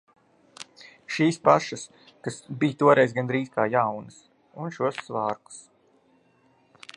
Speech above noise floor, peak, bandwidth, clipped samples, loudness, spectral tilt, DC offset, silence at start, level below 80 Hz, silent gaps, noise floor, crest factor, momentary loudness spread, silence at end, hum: 38 dB; -4 dBFS; 11.5 kHz; under 0.1%; -24 LUFS; -5.5 dB/octave; under 0.1%; 0.6 s; -72 dBFS; none; -63 dBFS; 24 dB; 24 LU; 1.35 s; none